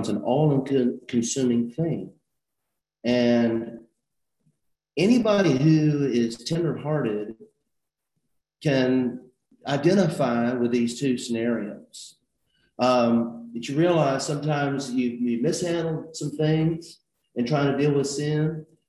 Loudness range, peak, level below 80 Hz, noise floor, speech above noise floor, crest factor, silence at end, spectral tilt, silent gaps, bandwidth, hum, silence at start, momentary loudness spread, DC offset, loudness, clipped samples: 4 LU; -8 dBFS; -62 dBFS; -83 dBFS; 60 dB; 16 dB; 0.25 s; -6 dB/octave; none; 12 kHz; none; 0 s; 12 LU; under 0.1%; -24 LUFS; under 0.1%